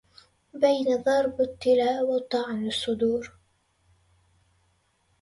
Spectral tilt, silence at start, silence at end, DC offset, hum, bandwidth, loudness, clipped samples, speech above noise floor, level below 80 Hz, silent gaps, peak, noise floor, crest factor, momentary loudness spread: -4.5 dB/octave; 0.55 s; 1.95 s; under 0.1%; none; 11.5 kHz; -25 LUFS; under 0.1%; 44 dB; -62 dBFS; none; -10 dBFS; -69 dBFS; 18 dB; 7 LU